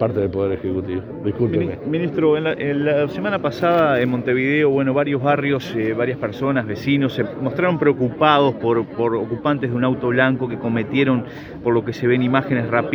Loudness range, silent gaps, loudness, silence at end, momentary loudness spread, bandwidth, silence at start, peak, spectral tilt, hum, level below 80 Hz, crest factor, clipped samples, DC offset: 2 LU; none; -19 LUFS; 0 s; 6 LU; 20 kHz; 0 s; 0 dBFS; -8 dB/octave; none; -52 dBFS; 18 dB; under 0.1%; under 0.1%